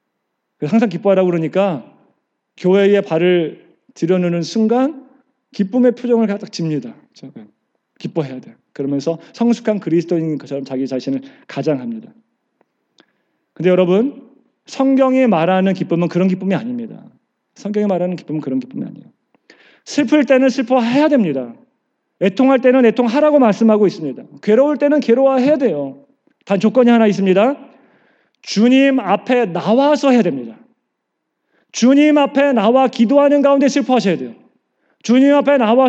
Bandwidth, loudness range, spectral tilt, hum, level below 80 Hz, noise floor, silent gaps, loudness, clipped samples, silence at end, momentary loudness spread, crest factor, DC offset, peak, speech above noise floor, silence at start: 8 kHz; 8 LU; -6.5 dB/octave; none; -84 dBFS; -74 dBFS; none; -15 LUFS; under 0.1%; 0 s; 14 LU; 16 dB; under 0.1%; 0 dBFS; 60 dB; 0.6 s